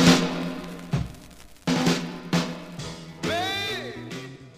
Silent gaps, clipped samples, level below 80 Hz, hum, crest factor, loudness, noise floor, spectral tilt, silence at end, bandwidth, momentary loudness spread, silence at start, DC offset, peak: none; under 0.1%; -48 dBFS; none; 22 dB; -27 LUFS; -46 dBFS; -4.5 dB/octave; 0 s; 15.5 kHz; 14 LU; 0 s; under 0.1%; -4 dBFS